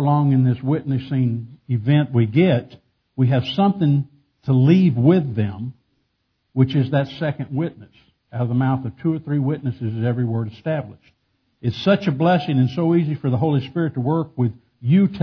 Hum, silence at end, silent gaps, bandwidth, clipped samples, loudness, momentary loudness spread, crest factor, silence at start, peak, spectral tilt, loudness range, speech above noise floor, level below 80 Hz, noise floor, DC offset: none; 0 s; none; 5.4 kHz; under 0.1%; -20 LUFS; 10 LU; 18 dB; 0 s; -2 dBFS; -9.5 dB/octave; 5 LU; 52 dB; -58 dBFS; -71 dBFS; under 0.1%